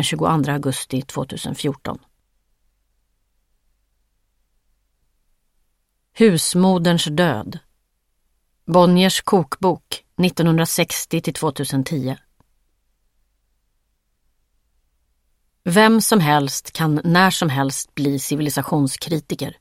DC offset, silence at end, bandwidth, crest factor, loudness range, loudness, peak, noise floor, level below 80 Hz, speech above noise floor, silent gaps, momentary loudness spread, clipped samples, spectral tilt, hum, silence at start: under 0.1%; 0.1 s; 16.5 kHz; 20 dB; 12 LU; -18 LUFS; 0 dBFS; -69 dBFS; -56 dBFS; 51 dB; none; 13 LU; under 0.1%; -5 dB/octave; none; 0 s